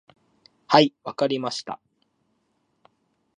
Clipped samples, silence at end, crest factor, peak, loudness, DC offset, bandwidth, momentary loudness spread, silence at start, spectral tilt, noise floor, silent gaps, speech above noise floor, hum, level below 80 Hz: under 0.1%; 1.65 s; 24 dB; -2 dBFS; -22 LUFS; under 0.1%; 10 kHz; 18 LU; 0.7 s; -5 dB/octave; -71 dBFS; none; 49 dB; none; -76 dBFS